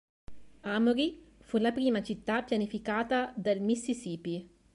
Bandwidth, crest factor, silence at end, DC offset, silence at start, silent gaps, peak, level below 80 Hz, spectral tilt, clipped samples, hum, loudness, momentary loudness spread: 11.5 kHz; 14 dB; 0.3 s; under 0.1%; 0.3 s; none; -16 dBFS; -62 dBFS; -5.5 dB/octave; under 0.1%; none; -31 LUFS; 9 LU